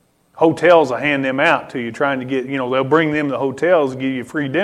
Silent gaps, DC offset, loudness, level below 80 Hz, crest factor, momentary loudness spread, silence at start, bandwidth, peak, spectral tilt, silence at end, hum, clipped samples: none; under 0.1%; -17 LUFS; -60 dBFS; 16 dB; 9 LU; 0.35 s; 11.5 kHz; 0 dBFS; -6 dB/octave; 0 s; none; under 0.1%